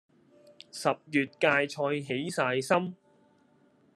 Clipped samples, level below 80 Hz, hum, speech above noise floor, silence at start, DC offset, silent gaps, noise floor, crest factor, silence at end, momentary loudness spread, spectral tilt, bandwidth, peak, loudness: under 0.1%; -78 dBFS; none; 36 dB; 0.75 s; under 0.1%; none; -64 dBFS; 22 dB; 1 s; 7 LU; -4.5 dB/octave; 13 kHz; -8 dBFS; -29 LUFS